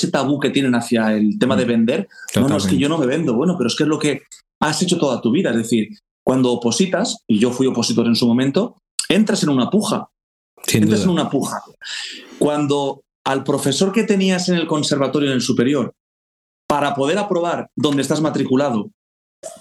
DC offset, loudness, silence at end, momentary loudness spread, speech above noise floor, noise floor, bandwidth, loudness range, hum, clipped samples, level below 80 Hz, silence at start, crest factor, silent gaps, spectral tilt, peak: under 0.1%; -18 LUFS; 0.05 s; 9 LU; over 73 dB; under -90 dBFS; 14 kHz; 3 LU; none; under 0.1%; -58 dBFS; 0 s; 16 dB; 4.55-4.61 s, 6.11-6.26 s, 8.91-8.98 s, 10.23-10.57 s, 13.15-13.25 s, 16.00-16.69 s, 18.94-19.43 s; -5 dB/octave; -2 dBFS